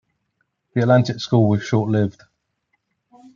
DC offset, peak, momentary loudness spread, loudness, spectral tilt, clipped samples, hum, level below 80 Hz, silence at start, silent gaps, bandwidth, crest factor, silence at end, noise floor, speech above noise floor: under 0.1%; -2 dBFS; 7 LU; -19 LUFS; -7.5 dB/octave; under 0.1%; none; -62 dBFS; 0.75 s; none; 7.2 kHz; 18 dB; 1.25 s; -72 dBFS; 54 dB